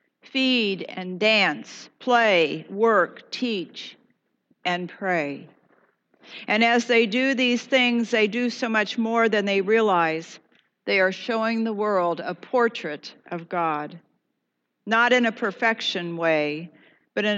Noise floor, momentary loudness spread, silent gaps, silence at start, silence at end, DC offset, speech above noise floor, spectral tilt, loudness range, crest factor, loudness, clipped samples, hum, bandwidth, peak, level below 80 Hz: -78 dBFS; 15 LU; none; 0.35 s; 0 s; under 0.1%; 55 dB; -4.5 dB/octave; 5 LU; 18 dB; -22 LUFS; under 0.1%; none; 8 kHz; -6 dBFS; under -90 dBFS